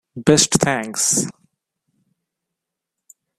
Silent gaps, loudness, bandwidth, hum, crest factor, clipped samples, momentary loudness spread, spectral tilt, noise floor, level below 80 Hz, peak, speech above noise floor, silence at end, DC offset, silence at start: none; -17 LUFS; 16 kHz; none; 22 dB; under 0.1%; 6 LU; -3 dB/octave; -82 dBFS; -52 dBFS; 0 dBFS; 65 dB; 2.1 s; under 0.1%; 0.15 s